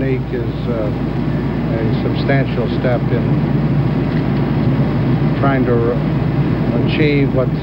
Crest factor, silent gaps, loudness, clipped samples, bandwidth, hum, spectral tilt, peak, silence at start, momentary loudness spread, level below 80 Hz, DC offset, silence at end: 12 dB; none; -16 LUFS; under 0.1%; 5.6 kHz; none; -10 dB/octave; -2 dBFS; 0 s; 5 LU; -30 dBFS; under 0.1%; 0 s